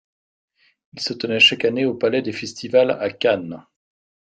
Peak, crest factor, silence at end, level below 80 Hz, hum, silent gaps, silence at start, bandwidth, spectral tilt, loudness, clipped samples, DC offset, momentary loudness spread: -2 dBFS; 20 dB; 0.75 s; -66 dBFS; none; none; 0.95 s; 9.2 kHz; -4 dB/octave; -19 LUFS; under 0.1%; under 0.1%; 15 LU